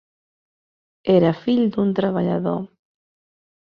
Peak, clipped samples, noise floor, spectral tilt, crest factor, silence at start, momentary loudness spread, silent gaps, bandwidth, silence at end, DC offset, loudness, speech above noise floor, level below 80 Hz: -4 dBFS; under 0.1%; under -90 dBFS; -9.5 dB/octave; 18 dB; 1.05 s; 12 LU; none; 5.6 kHz; 1.05 s; under 0.1%; -20 LUFS; over 71 dB; -60 dBFS